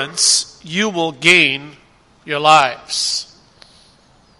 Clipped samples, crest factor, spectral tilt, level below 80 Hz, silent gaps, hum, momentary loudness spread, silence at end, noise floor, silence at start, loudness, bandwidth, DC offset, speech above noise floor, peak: under 0.1%; 18 dB; -1.5 dB/octave; -58 dBFS; none; none; 13 LU; 1.15 s; -51 dBFS; 0 s; -14 LUFS; 14.5 kHz; under 0.1%; 36 dB; 0 dBFS